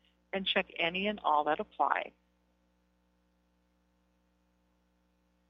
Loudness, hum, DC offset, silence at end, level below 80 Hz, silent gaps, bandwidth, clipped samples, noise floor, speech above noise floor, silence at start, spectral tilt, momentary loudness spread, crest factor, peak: -32 LUFS; 60 Hz at -75 dBFS; under 0.1%; 3.4 s; -70 dBFS; none; 6 kHz; under 0.1%; -73 dBFS; 41 dB; 0.35 s; -1 dB/octave; 6 LU; 26 dB; -12 dBFS